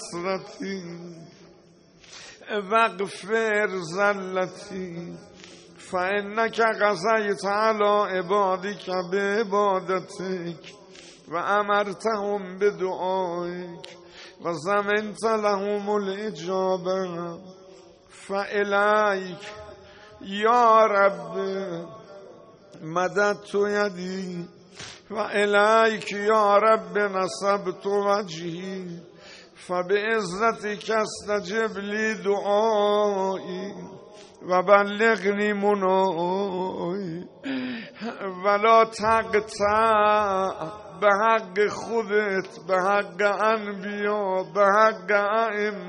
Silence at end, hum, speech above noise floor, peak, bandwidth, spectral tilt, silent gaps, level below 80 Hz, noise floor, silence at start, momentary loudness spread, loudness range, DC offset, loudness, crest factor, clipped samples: 0 s; none; 30 dB; -4 dBFS; 10 kHz; -4.5 dB/octave; none; -64 dBFS; -54 dBFS; 0 s; 17 LU; 5 LU; under 0.1%; -24 LUFS; 20 dB; under 0.1%